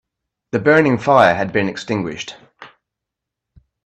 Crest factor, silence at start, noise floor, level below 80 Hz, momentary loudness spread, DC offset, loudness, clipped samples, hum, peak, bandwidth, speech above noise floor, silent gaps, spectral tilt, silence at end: 18 dB; 0.55 s; -83 dBFS; -56 dBFS; 14 LU; under 0.1%; -16 LUFS; under 0.1%; none; 0 dBFS; 9.8 kHz; 67 dB; none; -6 dB/octave; 1.2 s